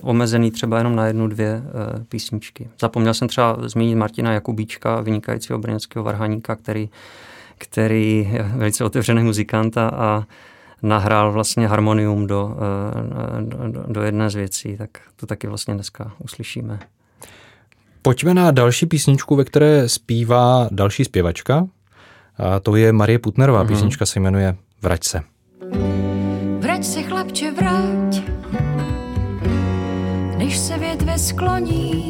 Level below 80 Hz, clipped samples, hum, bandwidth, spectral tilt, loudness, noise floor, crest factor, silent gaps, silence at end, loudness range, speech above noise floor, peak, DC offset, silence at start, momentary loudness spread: -38 dBFS; under 0.1%; none; 16.5 kHz; -6 dB/octave; -19 LUFS; -53 dBFS; 18 dB; none; 0 s; 8 LU; 35 dB; 0 dBFS; under 0.1%; 0 s; 12 LU